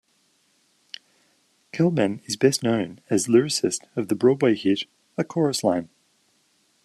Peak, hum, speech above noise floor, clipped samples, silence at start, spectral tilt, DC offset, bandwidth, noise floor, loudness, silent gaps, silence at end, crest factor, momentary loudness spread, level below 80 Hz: -6 dBFS; none; 44 dB; under 0.1%; 1.75 s; -5 dB/octave; under 0.1%; 13.5 kHz; -66 dBFS; -23 LUFS; none; 1 s; 20 dB; 15 LU; -68 dBFS